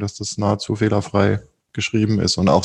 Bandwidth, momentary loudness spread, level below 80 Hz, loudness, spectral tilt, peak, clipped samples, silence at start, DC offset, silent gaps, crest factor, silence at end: 10.5 kHz; 8 LU; -46 dBFS; -20 LUFS; -5.5 dB/octave; -2 dBFS; under 0.1%; 0 s; under 0.1%; none; 18 dB; 0 s